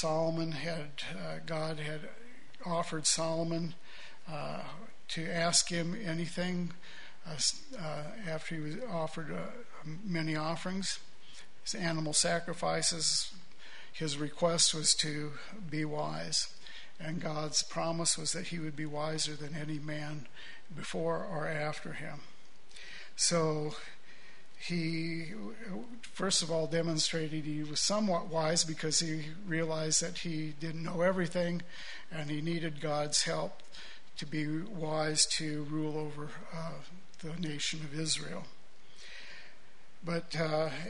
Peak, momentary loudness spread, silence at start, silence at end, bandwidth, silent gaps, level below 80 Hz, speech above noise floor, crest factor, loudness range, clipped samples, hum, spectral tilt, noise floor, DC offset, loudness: -12 dBFS; 18 LU; 0 s; 0 s; 11 kHz; none; -64 dBFS; 27 dB; 24 dB; 6 LU; under 0.1%; none; -3 dB/octave; -62 dBFS; 1%; -34 LUFS